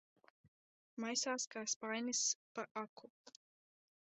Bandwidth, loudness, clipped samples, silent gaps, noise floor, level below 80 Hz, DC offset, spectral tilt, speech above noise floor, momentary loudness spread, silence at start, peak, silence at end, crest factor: 8.2 kHz; -40 LUFS; under 0.1%; 1.47-1.51 s, 1.76-1.81 s, 2.35-2.55 s, 2.71-2.75 s, 2.89-2.96 s, 3.10-3.24 s; under -90 dBFS; under -90 dBFS; under 0.1%; -0.5 dB/octave; over 47 dB; 18 LU; 0.95 s; -26 dBFS; 0.85 s; 20 dB